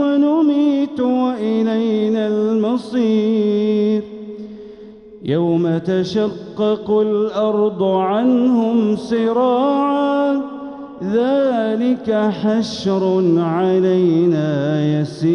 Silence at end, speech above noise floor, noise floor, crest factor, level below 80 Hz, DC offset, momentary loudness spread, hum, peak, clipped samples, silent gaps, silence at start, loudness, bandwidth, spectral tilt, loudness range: 0 s; 22 dB; -38 dBFS; 12 dB; -58 dBFS; under 0.1%; 7 LU; none; -6 dBFS; under 0.1%; none; 0 s; -17 LUFS; 9.8 kHz; -8 dB/octave; 3 LU